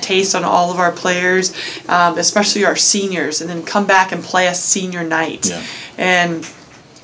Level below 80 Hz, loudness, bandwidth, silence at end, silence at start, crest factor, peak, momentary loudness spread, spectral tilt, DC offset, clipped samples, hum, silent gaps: -60 dBFS; -15 LUFS; 8 kHz; 0.25 s; 0 s; 16 dB; 0 dBFS; 7 LU; -2.5 dB/octave; under 0.1%; under 0.1%; none; none